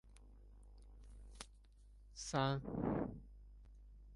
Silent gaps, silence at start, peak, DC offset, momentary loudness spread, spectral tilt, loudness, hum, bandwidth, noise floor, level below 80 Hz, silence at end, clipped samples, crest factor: none; 0.05 s; -22 dBFS; under 0.1%; 25 LU; -5.5 dB/octave; -42 LUFS; none; 11.5 kHz; -63 dBFS; -58 dBFS; 0 s; under 0.1%; 24 dB